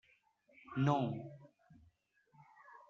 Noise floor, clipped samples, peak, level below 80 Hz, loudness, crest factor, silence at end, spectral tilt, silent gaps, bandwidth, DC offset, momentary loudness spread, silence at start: -73 dBFS; under 0.1%; -18 dBFS; -76 dBFS; -37 LUFS; 24 dB; 0.15 s; -7 dB/octave; none; 7 kHz; under 0.1%; 26 LU; 0.7 s